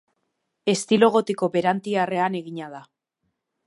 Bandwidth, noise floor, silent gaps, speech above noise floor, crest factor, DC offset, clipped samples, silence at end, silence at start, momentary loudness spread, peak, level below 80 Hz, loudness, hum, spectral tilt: 11.5 kHz; -77 dBFS; none; 55 dB; 20 dB; under 0.1%; under 0.1%; 0.85 s; 0.65 s; 16 LU; -4 dBFS; -74 dBFS; -22 LUFS; none; -5 dB/octave